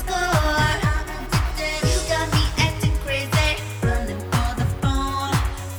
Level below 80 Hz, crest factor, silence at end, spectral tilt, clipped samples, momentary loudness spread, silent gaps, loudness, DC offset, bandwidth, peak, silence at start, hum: -28 dBFS; 16 dB; 0 s; -4.5 dB/octave; under 0.1%; 4 LU; none; -22 LUFS; under 0.1%; over 20 kHz; -6 dBFS; 0 s; none